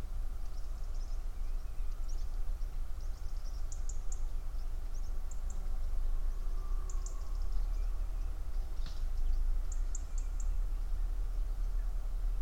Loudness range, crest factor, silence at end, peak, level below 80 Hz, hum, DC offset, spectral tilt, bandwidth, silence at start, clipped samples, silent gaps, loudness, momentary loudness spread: 4 LU; 12 dB; 0 s; -20 dBFS; -34 dBFS; none; under 0.1%; -5 dB/octave; 8.4 kHz; 0 s; under 0.1%; none; -43 LUFS; 5 LU